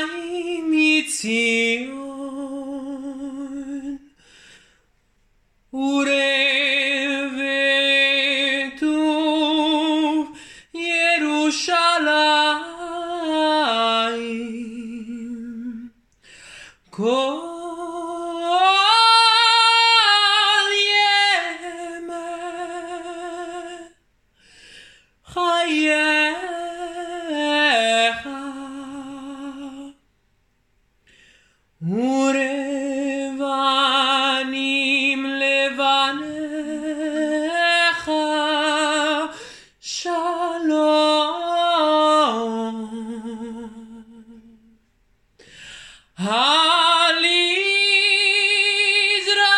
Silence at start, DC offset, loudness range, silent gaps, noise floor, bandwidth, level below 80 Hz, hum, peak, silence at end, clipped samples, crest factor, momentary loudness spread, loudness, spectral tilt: 0 s; under 0.1%; 15 LU; none; -65 dBFS; 12 kHz; -64 dBFS; none; -2 dBFS; 0 s; under 0.1%; 18 dB; 18 LU; -18 LUFS; -2 dB/octave